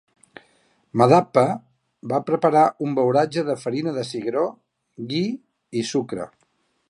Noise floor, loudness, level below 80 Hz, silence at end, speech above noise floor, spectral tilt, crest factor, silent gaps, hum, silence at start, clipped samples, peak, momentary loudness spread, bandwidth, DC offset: -67 dBFS; -22 LUFS; -68 dBFS; 0.65 s; 47 dB; -6.5 dB/octave; 20 dB; none; none; 0.95 s; under 0.1%; -2 dBFS; 16 LU; 11.5 kHz; under 0.1%